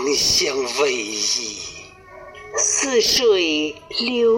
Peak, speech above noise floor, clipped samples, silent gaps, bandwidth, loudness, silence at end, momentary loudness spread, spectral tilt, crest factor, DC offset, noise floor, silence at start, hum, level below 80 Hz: -6 dBFS; 22 dB; under 0.1%; none; 16.5 kHz; -18 LUFS; 0 s; 14 LU; -1 dB/octave; 14 dB; under 0.1%; -41 dBFS; 0 s; none; -52 dBFS